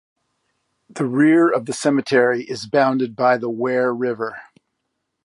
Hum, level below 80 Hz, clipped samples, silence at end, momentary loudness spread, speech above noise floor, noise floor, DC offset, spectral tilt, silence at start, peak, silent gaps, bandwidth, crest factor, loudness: none; -70 dBFS; under 0.1%; 0.85 s; 12 LU; 57 dB; -76 dBFS; under 0.1%; -5.5 dB/octave; 0.95 s; -4 dBFS; none; 11.5 kHz; 16 dB; -19 LUFS